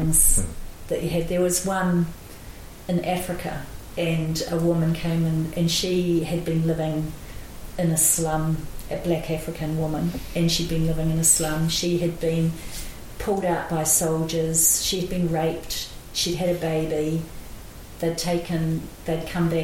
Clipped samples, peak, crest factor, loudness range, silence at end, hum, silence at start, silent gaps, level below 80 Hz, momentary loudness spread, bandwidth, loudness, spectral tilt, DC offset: under 0.1%; -4 dBFS; 20 dB; 4 LU; 0 s; none; 0 s; none; -36 dBFS; 16 LU; 17 kHz; -23 LUFS; -4 dB/octave; under 0.1%